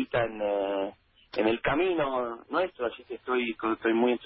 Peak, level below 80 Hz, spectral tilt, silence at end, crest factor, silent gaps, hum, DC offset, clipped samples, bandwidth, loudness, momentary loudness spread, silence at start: -14 dBFS; -58 dBFS; -9.5 dB/octave; 0 s; 16 dB; none; none; under 0.1%; under 0.1%; 5.8 kHz; -29 LUFS; 8 LU; 0 s